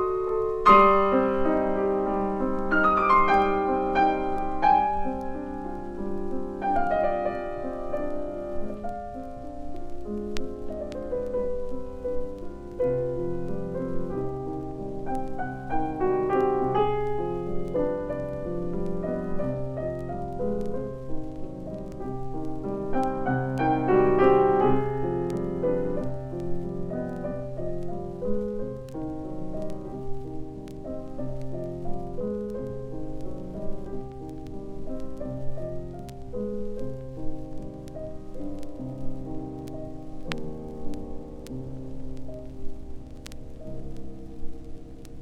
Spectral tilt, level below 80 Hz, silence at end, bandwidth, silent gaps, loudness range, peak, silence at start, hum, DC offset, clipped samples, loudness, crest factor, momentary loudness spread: -8 dB/octave; -40 dBFS; 0 s; 8 kHz; none; 14 LU; -4 dBFS; 0 s; none; under 0.1%; under 0.1%; -28 LUFS; 24 dB; 18 LU